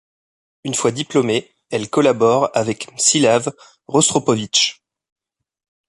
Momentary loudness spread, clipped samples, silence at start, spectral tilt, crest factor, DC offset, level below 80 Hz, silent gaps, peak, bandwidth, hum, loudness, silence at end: 10 LU; under 0.1%; 0.65 s; -3 dB/octave; 18 dB; under 0.1%; -60 dBFS; none; -2 dBFS; 11.5 kHz; none; -17 LUFS; 1.15 s